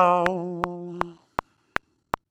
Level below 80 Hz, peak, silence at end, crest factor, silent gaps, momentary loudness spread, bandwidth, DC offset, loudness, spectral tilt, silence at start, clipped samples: -52 dBFS; -2 dBFS; 1.2 s; 24 dB; none; 11 LU; 18 kHz; under 0.1%; -29 LUFS; -6.5 dB/octave; 0 s; under 0.1%